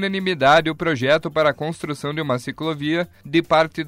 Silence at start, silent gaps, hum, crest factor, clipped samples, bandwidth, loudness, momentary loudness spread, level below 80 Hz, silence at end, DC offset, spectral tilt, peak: 0 s; none; none; 16 dB; under 0.1%; 16 kHz; -20 LUFS; 11 LU; -52 dBFS; 0 s; under 0.1%; -5.5 dB/octave; -4 dBFS